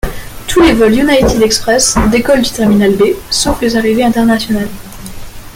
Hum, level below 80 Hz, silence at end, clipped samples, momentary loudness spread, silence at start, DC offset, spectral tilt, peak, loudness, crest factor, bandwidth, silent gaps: none; -26 dBFS; 0.05 s; under 0.1%; 15 LU; 0.05 s; under 0.1%; -4 dB/octave; 0 dBFS; -10 LUFS; 10 dB; 17 kHz; none